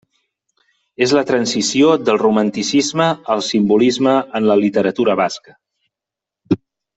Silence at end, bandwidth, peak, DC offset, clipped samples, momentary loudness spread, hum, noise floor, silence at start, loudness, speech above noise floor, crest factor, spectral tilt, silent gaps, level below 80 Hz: 0.4 s; 8.4 kHz; -2 dBFS; under 0.1%; under 0.1%; 8 LU; none; -86 dBFS; 1 s; -16 LUFS; 71 dB; 16 dB; -4.5 dB/octave; none; -58 dBFS